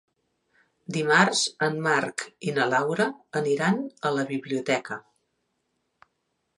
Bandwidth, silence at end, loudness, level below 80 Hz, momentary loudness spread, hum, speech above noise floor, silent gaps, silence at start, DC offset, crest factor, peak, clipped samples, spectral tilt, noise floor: 11.5 kHz; 1.55 s; -25 LUFS; -76 dBFS; 12 LU; none; 51 dB; none; 0.9 s; under 0.1%; 24 dB; -4 dBFS; under 0.1%; -4 dB/octave; -77 dBFS